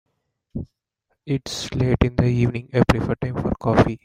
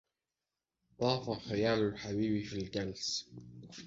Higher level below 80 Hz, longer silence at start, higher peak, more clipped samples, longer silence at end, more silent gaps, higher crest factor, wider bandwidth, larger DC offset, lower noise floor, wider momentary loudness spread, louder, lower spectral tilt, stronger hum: first, -36 dBFS vs -62 dBFS; second, 0.55 s vs 1 s; first, -2 dBFS vs -16 dBFS; neither; about the same, 0.1 s vs 0 s; neither; about the same, 20 dB vs 20 dB; first, 14 kHz vs 8 kHz; neither; second, -74 dBFS vs under -90 dBFS; first, 16 LU vs 11 LU; first, -21 LUFS vs -35 LUFS; first, -7 dB/octave vs -4.5 dB/octave; neither